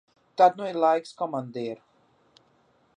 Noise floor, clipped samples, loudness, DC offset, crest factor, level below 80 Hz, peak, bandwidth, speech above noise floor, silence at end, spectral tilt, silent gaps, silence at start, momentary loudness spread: -64 dBFS; under 0.1%; -25 LUFS; under 0.1%; 20 dB; -82 dBFS; -6 dBFS; 10 kHz; 40 dB; 1.25 s; -6 dB/octave; none; 0.4 s; 16 LU